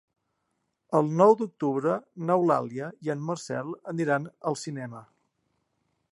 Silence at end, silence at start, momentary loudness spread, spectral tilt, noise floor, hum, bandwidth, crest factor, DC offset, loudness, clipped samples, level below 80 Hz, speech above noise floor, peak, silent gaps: 1.1 s; 0.9 s; 15 LU; -7 dB/octave; -78 dBFS; none; 11.5 kHz; 22 dB; under 0.1%; -27 LUFS; under 0.1%; -78 dBFS; 52 dB; -6 dBFS; none